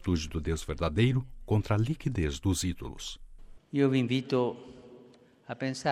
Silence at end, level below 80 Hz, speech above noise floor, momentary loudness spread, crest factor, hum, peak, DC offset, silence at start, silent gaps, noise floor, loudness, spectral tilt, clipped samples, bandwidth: 0 s; -46 dBFS; 28 dB; 14 LU; 18 dB; none; -12 dBFS; under 0.1%; 0 s; none; -57 dBFS; -30 LUFS; -6 dB/octave; under 0.1%; 15 kHz